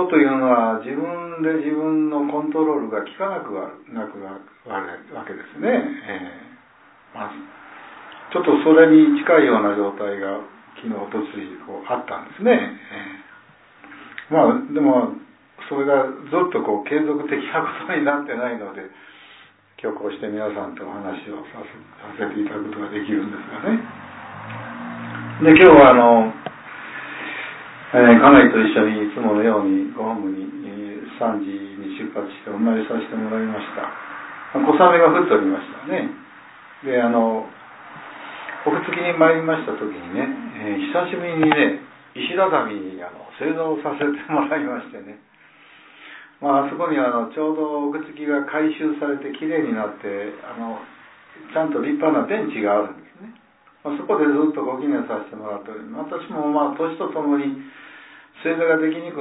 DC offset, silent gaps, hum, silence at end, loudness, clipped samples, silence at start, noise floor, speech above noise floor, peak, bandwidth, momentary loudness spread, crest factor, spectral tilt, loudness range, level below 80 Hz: under 0.1%; none; none; 0 s; -19 LUFS; under 0.1%; 0 s; -51 dBFS; 32 dB; 0 dBFS; 4 kHz; 20 LU; 20 dB; -10 dB/octave; 13 LU; -58 dBFS